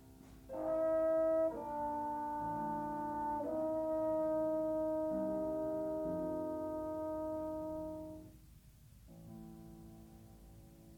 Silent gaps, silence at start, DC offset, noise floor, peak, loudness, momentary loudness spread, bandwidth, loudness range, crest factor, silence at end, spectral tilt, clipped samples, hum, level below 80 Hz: none; 0 s; under 0.1%; -60 dBFS; -26 dBFS; -38 LUFS; 23 LU; 18.5 kHz; 10 LU; 12 dB; 0 s; -8 dB/octave; under 0.1%; none; -62 dBFS